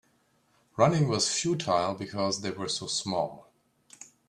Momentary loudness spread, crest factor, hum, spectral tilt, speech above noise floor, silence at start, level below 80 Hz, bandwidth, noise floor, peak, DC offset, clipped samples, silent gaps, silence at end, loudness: 11 LU; 22 dB; none; -4 dB/octave; 40 dB; 0.75 s; -66 dBFS; 12 kHz; -68 dBFS; -8 dBFS; under 0.1%; under 0.1%; none; 0.25 s; -28 LUFS